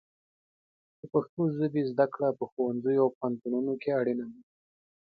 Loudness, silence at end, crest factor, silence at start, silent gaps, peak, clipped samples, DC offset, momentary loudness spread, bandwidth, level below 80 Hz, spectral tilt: -30 LUFS; 0.6 s; 20 dB; 1.05 s; 1.29-1.37 s, 2.52-2.57 s, 3.15-3.21 s; -12 dBFS; under 0.1%; under 0.1%; 5 LU; 5 kHz; -76 dBFS; -11 dB/octave